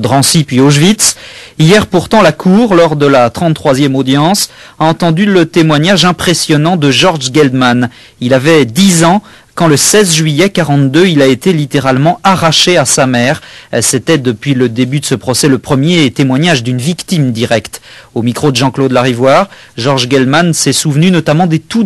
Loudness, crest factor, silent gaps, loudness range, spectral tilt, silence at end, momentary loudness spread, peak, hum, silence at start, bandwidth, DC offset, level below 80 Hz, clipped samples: -9 LUFS; 8 dB; none; 3 LU; -4.5 dB/octave; 0 s; 7 LU; 0 dBFS; none; 0 s; 13 kHz; 0.5%; -42 dBFS; 0.5%